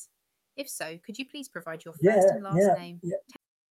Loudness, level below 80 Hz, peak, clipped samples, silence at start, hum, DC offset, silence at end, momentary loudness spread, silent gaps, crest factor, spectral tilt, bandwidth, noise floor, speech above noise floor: -26 LUFS; -70 dBFS; -10 dBFS; under 0.1%; 0 s; none; under 0.1%; 0.5 s; 17 LU; none; 18 dB; -6 dB/octave; 15.5 kHz; -77 dBFS; 50 dB